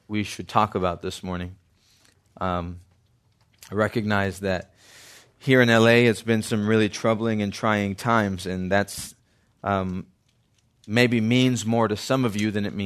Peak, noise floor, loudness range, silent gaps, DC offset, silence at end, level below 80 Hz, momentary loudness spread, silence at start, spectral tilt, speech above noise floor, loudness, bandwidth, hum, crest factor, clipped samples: -2 dBFS; -65 dBFS; 8 LU; none; under 0.1%; 0 s; -60 dBFS; 13 LU; 0.1 s; -5.5 dB/octave; 42 dB; -23 LUFS; 13.5 kHz; none; 22 dB; under 0.1%